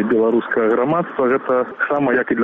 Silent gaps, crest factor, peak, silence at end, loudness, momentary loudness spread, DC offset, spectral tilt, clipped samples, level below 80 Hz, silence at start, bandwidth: none; 10 dB; -6 dBFS; 0 s; -18 LUFS; 3 LU; under 0.1%; -9.5 dB/octave; under 0.1%; -58 dBFS; 0 s; 3.9 kHz